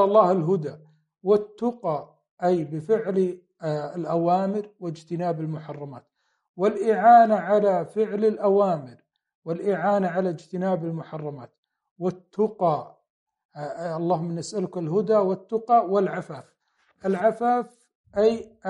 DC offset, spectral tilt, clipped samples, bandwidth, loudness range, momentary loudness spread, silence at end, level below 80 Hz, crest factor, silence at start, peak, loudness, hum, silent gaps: under 0.1%; -7.5 dB/octave; under 0.1%; 10 kHz; 8 LU; 15 LU; 0 s; -70 dBFS; 20 dB; 0 s; -4 dBFS; -24 LUFS; none; 2.31-2.37 s, 6.49-6.54 s, 9.35-9.42 s, 11.58-11.63 s, 11.91-11.96 s, 13.10-13.27 s, 13.45-13.49 s, 17.95-18.04 s